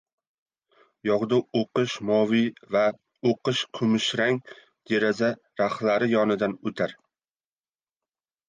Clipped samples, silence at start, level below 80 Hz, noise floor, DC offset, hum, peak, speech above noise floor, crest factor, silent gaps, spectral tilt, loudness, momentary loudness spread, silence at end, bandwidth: under 0.1%; 1.05 s; -68 dBFS; under -90 dBFS; under 0.1%; none; -10 dBFS; over 66 dB; 16 dB; none; -5.5 dB/octave; -25 LUFS; 6 LU; 1.55 s; 9.6 kHz